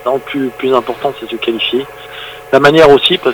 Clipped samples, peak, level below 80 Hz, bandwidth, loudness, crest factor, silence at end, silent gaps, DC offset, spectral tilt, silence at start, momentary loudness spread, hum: 1%; 0 dBFS; -44 dBFS; over 20 kHz; -11 LUFS; 12 dB; 0 s; none; under 0.1%; -5 dB/octave; 0 s; 21 LU; none